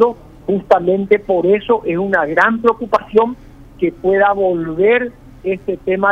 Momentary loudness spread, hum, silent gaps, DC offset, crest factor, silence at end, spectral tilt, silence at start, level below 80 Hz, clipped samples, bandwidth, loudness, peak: 8 LU; none; none; under 0.1%; 14 dB; 0 s; -7.5 dB/octave; 0 s; -44 dBFS; under 0.1%; 7 kHz; -15 LUFS; 0 dBFS